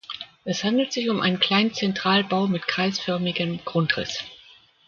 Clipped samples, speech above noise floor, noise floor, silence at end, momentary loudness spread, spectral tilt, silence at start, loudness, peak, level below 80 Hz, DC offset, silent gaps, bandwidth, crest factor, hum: under 0.1%; 29 dB; -53 dBFS; 0.5 s; 10 LU; -5 dB/octave; 0.1 s; -23 LUFS; -4 dBFS; -62 dBFS; under 0.1%; none; 7.4 kHz; 22 dB; none